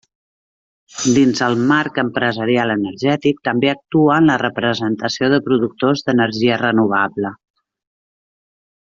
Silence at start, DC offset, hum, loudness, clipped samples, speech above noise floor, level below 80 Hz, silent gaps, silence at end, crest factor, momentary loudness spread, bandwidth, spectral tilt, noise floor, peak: 0.95 s; under 0.1%; none; -16 LUFS; under 0.1%; over 74 dB; -56 dBFS; none; 1.55 s; 16 dB; 6 LU; 7.8 kHz; -5 dB/octave; under -90 dBFS; -2 dBFS